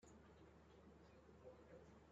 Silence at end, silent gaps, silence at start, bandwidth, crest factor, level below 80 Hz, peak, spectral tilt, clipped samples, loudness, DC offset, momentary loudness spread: 0 s; none; 0 s; 7.6 kHz; 16 dB; -76 dBFS; -50 dBFS; -6 dB/octave; under 0.1%; -66 LUFS; under 0.1%; 3 LU